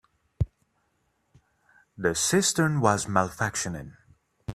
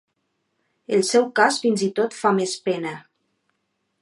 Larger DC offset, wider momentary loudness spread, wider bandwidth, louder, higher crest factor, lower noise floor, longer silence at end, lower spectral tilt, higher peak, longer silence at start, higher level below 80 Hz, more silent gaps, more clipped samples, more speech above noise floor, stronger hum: neither; first, 14 LU vs 9 LU; first, 15.5 kHz vs 11.5 kHz; second, -26 LUFS vs -21 LUFS; about the same, 24 dB vs 22 dB; about the same, -72 dBFS vs -74 dBFS; second, 0 s vs 1 s; about the same, -4 dB/octave vs -4 dB/octave; about the same, -4 dBFS vs -2 dBFS; second, 0.4 s vs 0.9 s; first, -48 dBFS vs -76 dBFS; neither; neither; second, 47 dB vs 53 dB; neither